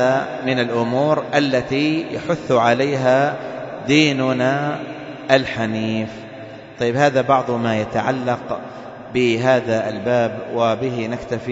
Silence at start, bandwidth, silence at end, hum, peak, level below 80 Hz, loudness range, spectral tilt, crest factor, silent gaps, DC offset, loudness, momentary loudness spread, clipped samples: 0 s; 8 kHz; 0 s; none; 0 dBFS; -54 dBFS; 2 LU; -6 dB/octave; 18 dB; none; under 0.1%; -19 LUFS; 12 LU; under 0.1%